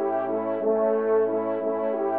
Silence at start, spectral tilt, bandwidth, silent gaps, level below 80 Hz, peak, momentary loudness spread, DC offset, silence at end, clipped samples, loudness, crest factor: 0 s; -6.5 dB/octave; 3.5 kHz; none; -78 dBFS; -14 dBFS; 4 LU; 0.1%; 0 s; under 0.1%; -25 LUFS; 12 dB